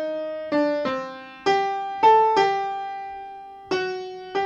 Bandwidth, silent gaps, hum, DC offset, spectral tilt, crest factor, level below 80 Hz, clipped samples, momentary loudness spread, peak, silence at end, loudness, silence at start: 7.8 kHz; none; none; under 0.1%; -4.5 dB/octave; 18 dB; -66 dBFS; under 0.1%; 18 LU; -6 dBFS; 0 s; -23 LUFS; 0 s